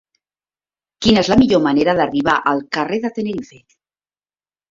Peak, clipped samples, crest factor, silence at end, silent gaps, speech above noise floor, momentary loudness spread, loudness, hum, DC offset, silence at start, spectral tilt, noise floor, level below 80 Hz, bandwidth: -2 dBFS; under 0.1%; 16 dB; 1.25 s; none; over 74 dB; 10 LU; -16 LUFS; 50 Hz at -50 dBFS; under 0.1%; 1 s; -5.5 dB/octave; under -90 dBFS; -44 dBFS; 7.6 kHz